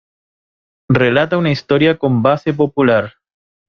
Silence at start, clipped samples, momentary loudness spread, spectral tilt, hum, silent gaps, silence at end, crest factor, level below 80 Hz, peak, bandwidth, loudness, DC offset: 0.9 s; under 0.1%; 4 LU; -8 dB/octave; none; none; 0.6 s; 14 dB; -50 dBFS; -2 dBFS; 6.6 kHz; -14 LUFS; under 0.1%